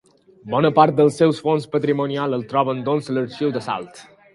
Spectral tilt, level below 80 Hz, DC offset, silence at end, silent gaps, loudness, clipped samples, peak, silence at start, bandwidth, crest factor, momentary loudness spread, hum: -7 dB/octave; -64 dBFS; under 0.1%; 0.3 s; none; -20 LUFS; under 0.1%; 0 dBFS; 0.45 s; 11.5 kHz; 20 dB; 10 LU; none